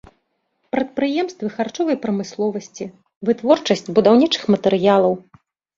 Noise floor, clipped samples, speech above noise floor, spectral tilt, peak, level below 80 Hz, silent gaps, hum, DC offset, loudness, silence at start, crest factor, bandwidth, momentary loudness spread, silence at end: -69 dBFS; under 0.1%; 51 dB; -5.5 dB/octave; -2 dBFS; -60 dBFS; 3.16-3.21 s; none; under 0.1%; -19 LUFS; 0.75 s; 18 dB; 7.6 kHz; 13 LU; 0.6 s